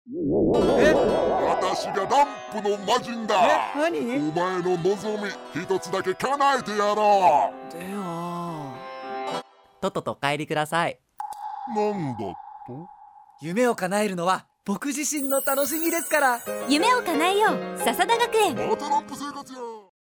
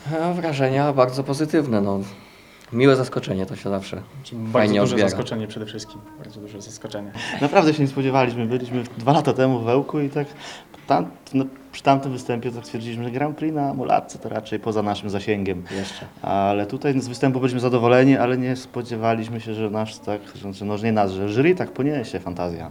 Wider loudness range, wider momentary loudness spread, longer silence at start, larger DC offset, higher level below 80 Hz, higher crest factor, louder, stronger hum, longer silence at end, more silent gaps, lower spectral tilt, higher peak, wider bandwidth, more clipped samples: first, 7 LU vs 4 LU; about the same, 15 LU vs 15 LU; about the same, 0.05 s vs 0 s; neither; about the same, -54 dBFS vs -58 dBFS; about the same, 18 dB vs 22 dB; about the same, -24 LUFS vs -22 LUFS; neither; first, 0.2 s vs 0 s; neither; second, -4 dB/octave vs -6.5 dB/octave; second, -6 dBFS vs 0 dBFS; first, over 20 kHz vs 14 kHz; neither